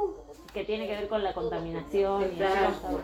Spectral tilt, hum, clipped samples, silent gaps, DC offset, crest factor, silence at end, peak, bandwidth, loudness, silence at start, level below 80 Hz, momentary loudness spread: -6 dB/octave; none; under 0.1%; none; under 0.1%; 16 dB; 0 s; -14 dBFS; 15 kHz; -30 LUFS; 0 s; -50 dBFS; 10 LU